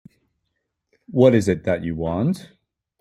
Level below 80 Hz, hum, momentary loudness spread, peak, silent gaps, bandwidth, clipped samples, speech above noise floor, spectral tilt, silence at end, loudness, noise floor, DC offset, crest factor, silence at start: -52 dBFS; none; 11 LU; -2 dBFS; none; 13 kHz; under 0.1%; 57 dB; -7.5 dB/octave; 0.6 s; -20 LUFS; -76 dBFS; under 0.1%; 20 dB; 1.1 s